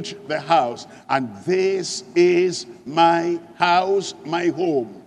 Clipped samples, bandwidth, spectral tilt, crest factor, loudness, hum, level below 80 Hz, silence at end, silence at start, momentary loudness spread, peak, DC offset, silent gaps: under 0.1%; 10.5 kHz; -4.5 dB/octave; 18 dB; -20 LUFS; none; -70 dBFS; 0.05 s; 0 s; 10 LU; -2 dBFS; under 0.1%; none